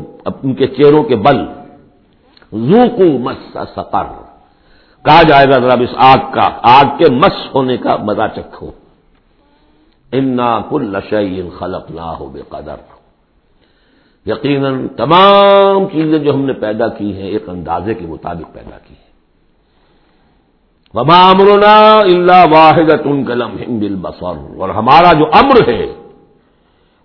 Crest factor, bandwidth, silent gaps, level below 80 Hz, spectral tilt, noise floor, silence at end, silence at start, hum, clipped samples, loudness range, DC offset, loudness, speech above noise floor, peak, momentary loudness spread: 12 dB; 5.4 kHz; none; -40 dBFS; -8 dB/octave; -54 dBFS; 1.05 s; 0 s; none; 1%; 14 LU; under 0.1%; -9 LUFS; 44 dB; 0 dBFS; 19 LU